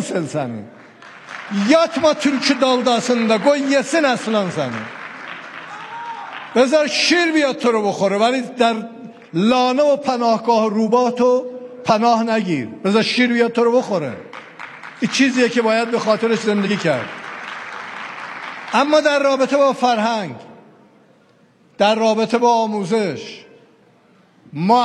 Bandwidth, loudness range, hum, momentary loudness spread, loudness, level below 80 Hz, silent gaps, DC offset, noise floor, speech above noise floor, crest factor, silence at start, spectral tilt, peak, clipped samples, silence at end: 11.5 kHz; 3 LU; none; 16 LU; -17 LUFS; -66 dBFS; none; under 0.1%; -53 dBFS; 37 dB; 16 dB; 0 s; -4.5 dB/octave; -2 dBFS; under 0.1%; 0 s